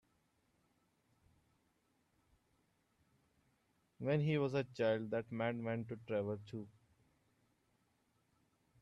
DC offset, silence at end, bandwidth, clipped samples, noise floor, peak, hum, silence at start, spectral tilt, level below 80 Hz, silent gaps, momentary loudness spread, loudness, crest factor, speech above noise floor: under 0.1%; 2.15 s; 7.8 kHz; under 0.1%; -79 dBFS; -26 dBFS; none; 4 s; -8 dB/octave; -80 dBFS; none; 11 LU; -39 LUFS; 18 dB; 41 dB